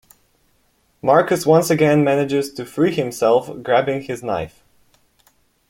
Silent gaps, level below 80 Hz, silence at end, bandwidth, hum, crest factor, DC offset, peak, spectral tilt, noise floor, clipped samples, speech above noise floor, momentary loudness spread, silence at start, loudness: none; -58 dBFS; 1.2 s; 16.5 kHz; none; 18 dB; under 0.1%; -2 dBFS; -6 dB/octave; -62 dBFS; under 0.1%; 45 dB; 10 LU; 1.05 s; -18 LUFS